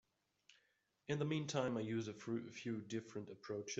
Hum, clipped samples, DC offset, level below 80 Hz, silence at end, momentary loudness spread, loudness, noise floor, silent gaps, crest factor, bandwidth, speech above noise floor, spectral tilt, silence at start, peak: none; under 0.1%; under 0.1%; -82 dBFS; 0 s; 9 LU; -44 LUFS; -81 dBFS; none; 20 dB; 8 kHz; 38 dB; -5.5 dB/octave; 0.5 s; -24 dBFS